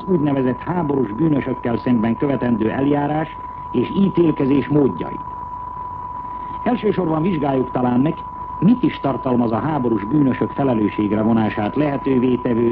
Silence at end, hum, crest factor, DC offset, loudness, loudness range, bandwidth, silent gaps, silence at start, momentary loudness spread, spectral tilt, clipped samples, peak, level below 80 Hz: 0 s; none; 12 dB; under 0.1%; -19 LUFS; 3 LU; 4.9 kHz; none; 0 s; 12 LU; -11 dB/octave; under 0.1%; -6 dBFS; -44 dBFS